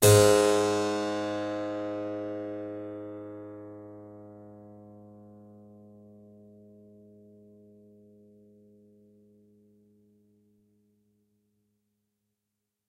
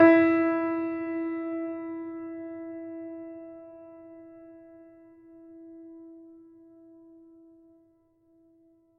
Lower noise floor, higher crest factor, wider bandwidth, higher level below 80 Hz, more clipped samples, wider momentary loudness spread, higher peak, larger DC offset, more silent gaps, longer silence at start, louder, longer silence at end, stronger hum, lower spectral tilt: first, -85 dBFS vs -65 dBFS; about the same, 26 dB vs 22 dB; first, 16 kHz vs 4.7 kHz; first, -62 dBFS vs -74 dBFS; neither; first, 29 LU vs 26 LU; about the same, -6 dBFS vs -8 dBFS; neither; neither; about the same, 0 s vs 0 s; about the same, -27 LUFS vs -29 LUFS; first, 7.9 s vs 2.6 s; neither; about the same, -4.5 dB/octave vs -5 dB/octave